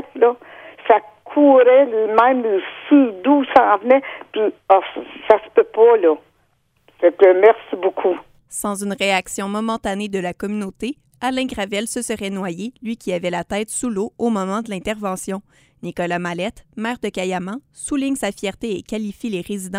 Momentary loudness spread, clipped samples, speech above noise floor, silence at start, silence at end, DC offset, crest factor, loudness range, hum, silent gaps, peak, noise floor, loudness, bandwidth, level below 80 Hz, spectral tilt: 15 LU; under 0.1%; 45 dB; 0 s; 0 s; under 0.1%; 18 dB; 10 LU; none; none; 0 dBFS; -62 dBFS; -18 LUFS; 16 kHz; -54 dBFS; -4.5 dB/octave